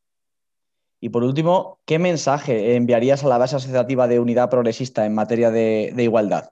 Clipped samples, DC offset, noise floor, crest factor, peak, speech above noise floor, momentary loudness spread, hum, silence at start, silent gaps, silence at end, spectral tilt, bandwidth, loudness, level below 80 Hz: under 0.1%; under 0.1%; -86 dBFS; 14 dB; -6 dBFS; 68 dB; 5 LU; none; 1 s; none; 0.05 s; -6.5 dB/octave; 8.2 kHz; -19 LUFS; -64 dBFS